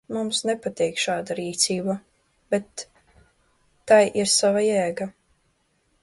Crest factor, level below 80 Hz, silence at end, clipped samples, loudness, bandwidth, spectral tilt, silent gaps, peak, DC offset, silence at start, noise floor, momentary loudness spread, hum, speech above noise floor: 20 dB; -64 dBFS; 0.9 s; under 0.1%; -22 LUFS; 11.5 kHz; -3 dB/octave; none; -4 dBFS; under 0.1%; 0.1 s; -68 dBFS; 17 LU; none; 45 dB